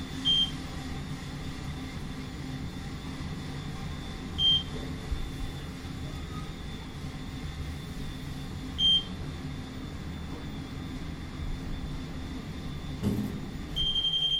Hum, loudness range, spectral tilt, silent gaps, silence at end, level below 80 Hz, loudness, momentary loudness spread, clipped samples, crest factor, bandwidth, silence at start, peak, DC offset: none; 8 LU; -4.5 dB/octave; none; 0 s; -42 dBFS; -32 LUFS; 15 LU; under 0.1%; 18 dB; 16 kHz; 0 s; -16 dBFS; under 0.1%